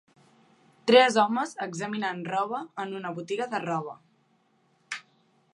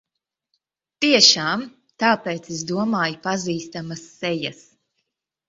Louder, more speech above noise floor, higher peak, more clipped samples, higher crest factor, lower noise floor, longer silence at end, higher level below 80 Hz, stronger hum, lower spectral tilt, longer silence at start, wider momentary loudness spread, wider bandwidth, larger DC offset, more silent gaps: second, -26 LUFS vs -20 LUFS; second, 41 dB vs 56 dB; second, -6 dBFS vs 0 dBFS; neither; about the same, 22 dB vs 24 dB; second, -67 dBFS vs -77 dBFS; second, 0.55 s vs 0.95 s; second, -82 dBFS vs -66 dBFS; neither; first, -4 dB/octave vs -2.5 dB/octave; second, 0.85 s vs 1 s; about the same, 20 LU vs 18 LU; first, 11.5 kHz vs 8 kHz; neither; neither